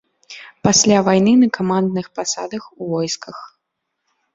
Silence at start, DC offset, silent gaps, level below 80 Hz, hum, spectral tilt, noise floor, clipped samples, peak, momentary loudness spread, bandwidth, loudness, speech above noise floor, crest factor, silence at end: 0.3 s; under 0.1%; none; -56 dBFS; none; -4 dB/octave; -76 dBFS; under 0.1%; -2 dBFS; 23 LU; 7.8 kHz; -16 LUFS; 59 dB; 18 dB; 0.9 s